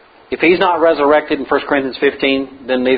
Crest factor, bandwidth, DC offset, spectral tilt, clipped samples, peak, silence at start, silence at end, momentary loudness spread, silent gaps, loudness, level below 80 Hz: 14 dB; 5 kHz; under 0.1%; -8 dB/octave; under 0.1%; 0 dBFS; 0.3 s; 0 s; 7 LU; none; -14 LUFS; -48 dBFS